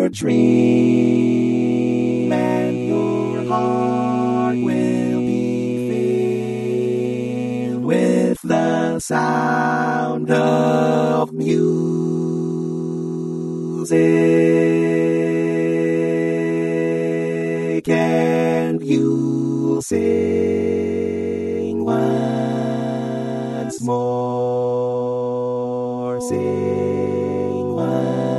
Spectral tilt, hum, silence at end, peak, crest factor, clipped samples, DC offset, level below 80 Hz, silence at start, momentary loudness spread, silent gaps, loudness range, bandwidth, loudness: -7 dB/octave; none; 0 s; -4 dBFS; 16 dB; under 0.1%; under 0.1%; -60 dBFS; 0 s; 7 LU; none; 4 LU; 12 kHz; -19 LUFS